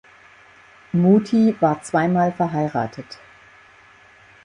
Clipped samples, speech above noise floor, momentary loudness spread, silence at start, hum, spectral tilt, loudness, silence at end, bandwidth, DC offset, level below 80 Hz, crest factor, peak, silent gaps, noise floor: under 0.1%; 31 dB; 17 LU; 0.95 s; none; -8 dB/octave; -19 LUFS; 1.3 s; 10.5 kHz; under 0.1%; -60 dBFS; 18 dB; -4 dBFS; none; -50 dBFS